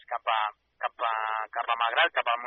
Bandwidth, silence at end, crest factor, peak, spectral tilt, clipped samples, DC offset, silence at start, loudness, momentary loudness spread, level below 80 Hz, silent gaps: 4.2 kHz; 0 s; 18 dB; -10 dBFS; 6 dB/octave; under 0.1%; under 0.1%; 0.1 s; -28 LUFS; 10 LU; -82 dBFS; none